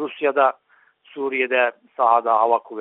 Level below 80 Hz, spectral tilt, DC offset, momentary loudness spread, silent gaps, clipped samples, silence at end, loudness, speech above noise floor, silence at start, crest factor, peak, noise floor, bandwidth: -74 dBFS; 0 dB/octave; under 0.1%; 8 LU; none; under 0.1%; 0 s; -20 LUFS; 34 dB; 0 s; 18 dB; -4 dBFS; -53 dBFS; 4.1 kHz